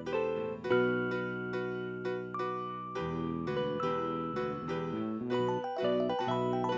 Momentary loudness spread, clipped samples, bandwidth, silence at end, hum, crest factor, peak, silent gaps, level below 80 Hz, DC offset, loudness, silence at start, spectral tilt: 6 LU; under 0.1%; 7.8 kHz; 0 s; none; 16 dB; -16 dBFS; none; -62 dBFS; under 0.1%; -34 LUFS; 0 s; -7.5 dB/octave